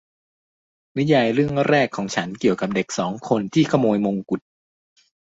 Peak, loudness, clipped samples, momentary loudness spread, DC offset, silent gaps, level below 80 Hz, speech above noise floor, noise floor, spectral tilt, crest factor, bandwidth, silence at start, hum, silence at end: -4 dBFS; -21 LUFS; under 0.1%; 8 LU; under 0.1%; none; -58 dBFS; over 70 dB; under -90 dBFS; -6 dB/octave; 18 dB; 8 kHz; 0.95 s; none; 1 s